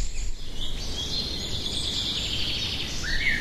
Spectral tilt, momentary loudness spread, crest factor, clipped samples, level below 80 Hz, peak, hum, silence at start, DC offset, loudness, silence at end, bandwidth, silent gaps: -2 dB/octave; 9 LU; 16 dB; under 0.1%; -34 dBFS; -10 dBFS; none; 0 s; under 0.1%; -28 LUFS; 0 s; 13.5 kHz; none